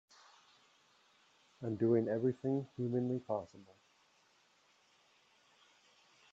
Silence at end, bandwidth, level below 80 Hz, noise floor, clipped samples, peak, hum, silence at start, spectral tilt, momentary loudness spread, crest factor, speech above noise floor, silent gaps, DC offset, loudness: 2.7 s; 7.8 kHz; -82 dBFS; -71 dBFS; under 0.1%; -22 dBFS; none; 1.6 s; -9 dB/octave; 11 LU; 20 dB; 35 dB; none; under 0.1%; -37 LUFS